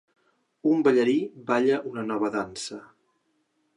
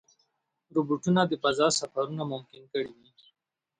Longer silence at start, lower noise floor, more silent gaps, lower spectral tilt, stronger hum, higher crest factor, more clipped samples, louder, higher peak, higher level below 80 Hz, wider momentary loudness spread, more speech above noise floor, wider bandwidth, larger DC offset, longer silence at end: about the same, 0.65 s vs 0.75 s; second, -72 dBFS vs -76 dBFS; neither; about the same, -5.5 dB/octave vs -4.5 dB/octave; neither; about the same, 18 dB vs 20 dB; neither; first, -25 LUFS vs -28 LUFS; about the same, -8 dBFS vs -10 dBFS; about the same, -70 dBFS vs -72 dBFS; first, 14 LU vs 11 LU; about the same, 47 dB vs 48 dB; first, 11 kHz vs 9.8 kHz; neither; about the same, 0.95 s vs 0.85 s